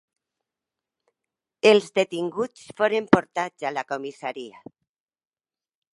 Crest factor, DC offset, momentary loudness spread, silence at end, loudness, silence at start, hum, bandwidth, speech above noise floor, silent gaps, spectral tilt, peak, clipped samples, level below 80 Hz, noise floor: 26 dB; under 0.1%; 15 LU; 1.45 s; -23 LUFS; 1.65 s; none; 11.5 kHz; over 67 dB; none; -5 dB/octave; 0 dBFS; under 0.1%; -66 dBFS; under -90 dBFS